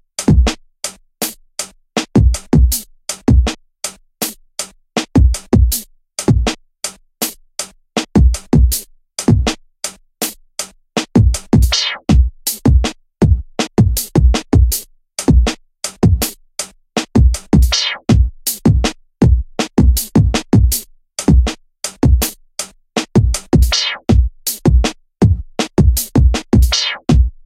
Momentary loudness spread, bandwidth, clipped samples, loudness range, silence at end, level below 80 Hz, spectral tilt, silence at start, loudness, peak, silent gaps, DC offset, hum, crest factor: 13 LU; 16.5 kHz; under 0.1%; 3 LU; 0.15 s; -18 dBFS; -5 dB/octave; 0.2 s; -15 LUFS; 0 dBFS; none; under 0.1%; none; 14 dB